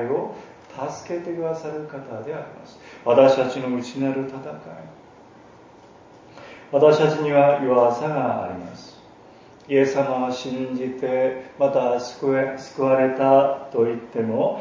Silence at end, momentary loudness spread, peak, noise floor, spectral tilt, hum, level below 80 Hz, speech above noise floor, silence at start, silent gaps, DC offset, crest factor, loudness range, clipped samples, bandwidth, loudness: 0 s; 19 LU; -2 dBFS; -48 dBFS; -6.5 dB/octave; none; -64 dBFS; 27 dB; 0 s; none; under 0.1%; 20 dB; 5 LU; under 0.1%; 7.6 kHz; -21 LUFS